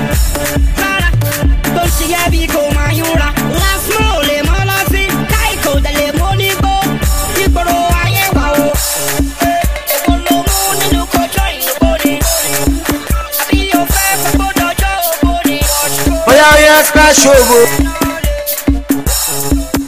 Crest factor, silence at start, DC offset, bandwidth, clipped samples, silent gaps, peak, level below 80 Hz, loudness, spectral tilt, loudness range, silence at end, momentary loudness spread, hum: 12 dB; 0 s; 2%; 16 kHz; 0.2%; none; 0 dBFS; -18 dBFS; -11 LUFS; -3.5 dB/octave; 5 LU; 0 s; 8 LU; none